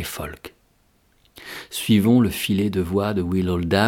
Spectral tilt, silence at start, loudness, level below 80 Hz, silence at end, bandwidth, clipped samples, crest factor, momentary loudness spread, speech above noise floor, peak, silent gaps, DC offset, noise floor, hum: -6 dB/octave; 0 s; -21 LUFS; -48 dBFS; 0 s; 18 kHz; under 0.1%; 20 dB; 19 LU; 41 dB; -2 dBFS; none; under 0.1%; -61 dBFS; none